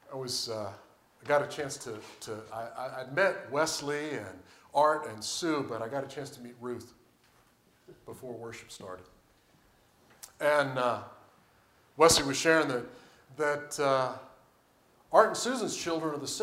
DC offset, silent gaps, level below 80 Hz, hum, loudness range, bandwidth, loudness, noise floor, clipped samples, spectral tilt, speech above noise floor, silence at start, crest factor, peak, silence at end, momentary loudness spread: under 0.1%; none; -64 dBFS; none; 16 LU; 16 kHz; -30 LUFS; -65 dBFS; under 0.1%; -3 dB/octave; 35 dB; 0.1 s; 24 dB; -8 dBFS; 0 s; 20 LU